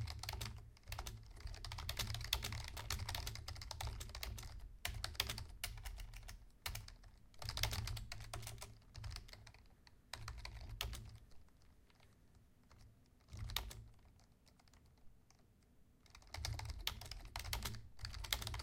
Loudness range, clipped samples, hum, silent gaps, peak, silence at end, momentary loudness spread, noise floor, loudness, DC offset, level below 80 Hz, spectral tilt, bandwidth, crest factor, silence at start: 8 LU; under 0.1%; none; none; -16 dBFS; 0 s; 18 LU; -69 dBFS; -47 LUFS; under 0.1%; -54 dBFS; -2.5 dB/octave; 17 kHz; 32 dB; 0 s